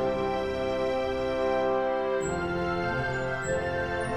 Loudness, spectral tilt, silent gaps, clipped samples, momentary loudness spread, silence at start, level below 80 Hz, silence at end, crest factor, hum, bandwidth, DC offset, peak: -29 LUFS; -5.5 dB/octave; none; under 0.1%; 3 LU; 0 s; -46 dBFS; 0 s; 14 dB; none; 10 kHz; under 0.1%; -14 dBFS